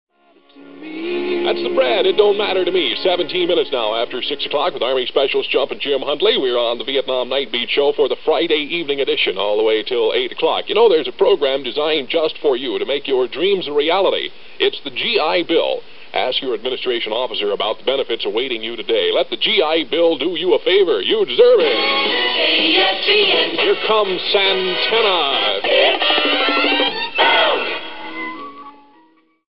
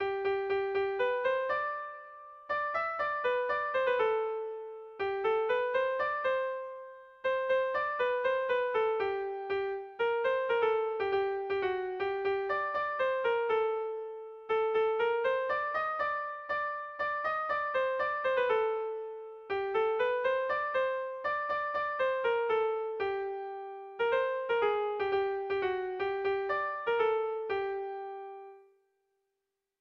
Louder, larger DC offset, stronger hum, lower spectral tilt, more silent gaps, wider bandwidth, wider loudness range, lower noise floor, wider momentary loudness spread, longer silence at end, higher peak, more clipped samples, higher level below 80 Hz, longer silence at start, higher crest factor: first, -16 LUFS vs -32 LUFS; first, 2% vs under 0.1%; neither; first, -7.5 dB/octave vs -5.5 dB/octave; neither; second, 5.6 kHz vs 6.4 kHz; first, 5 LU vs 1 LU; second, -54 dBFS vs -86 dBFS; about the same, 7 LU vs 9 LU; second, 0 s vs 1.2 s; first, 0 dBFS vs -18 dBFS; neither; first, -64 dBFS vs -70 dBFS; about the same, 0.05 s vs 0 s; about the same, 16 dB vs 14 dB